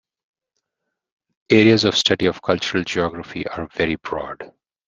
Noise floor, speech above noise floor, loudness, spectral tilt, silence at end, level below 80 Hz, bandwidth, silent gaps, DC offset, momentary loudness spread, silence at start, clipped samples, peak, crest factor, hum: -80 dBFS; 61 dB; -19 LUFS; -4.5 dB/octave; 0.4 s; -52 dBFS; 7.6 kHz; none; under 0.1%; 15 LU; 1.5 s; under 0.1%; -2 dBFS; 20 dB; none